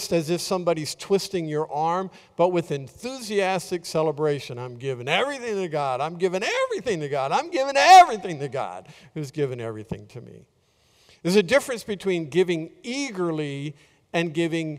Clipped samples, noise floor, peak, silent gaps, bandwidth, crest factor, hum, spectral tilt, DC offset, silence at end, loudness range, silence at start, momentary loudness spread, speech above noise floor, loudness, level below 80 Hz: under 0.1%; -62 dBFS; -4 dBFS; none; 16 kHz; 20 dB; none; -4.5 dB/octave; under 0.1%; 0 s; 7 LU; 0 s; 14 LU; 39 dB; -23 LUFS; -62 dBFS